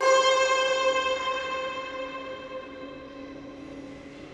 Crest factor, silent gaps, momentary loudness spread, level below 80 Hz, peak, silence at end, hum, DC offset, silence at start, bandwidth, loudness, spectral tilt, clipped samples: 18 dB; none; 20 LU; -60 dBFS; -10 dBFS; 0 s; none; under 0.1%; 0 s; 10 kHz; -26 LUFS; -1.5 dB/octave; under 0.1%